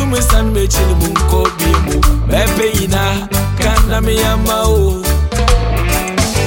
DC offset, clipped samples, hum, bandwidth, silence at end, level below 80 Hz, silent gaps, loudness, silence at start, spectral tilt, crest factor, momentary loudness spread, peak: under 0.1%; under 0.1%; none; 17 kHz; 0 s; -16 dBFS; none; -13 LUFS; 0 s; -4.5 dB/octave; 12 dB; 2 LU; 0 dBFS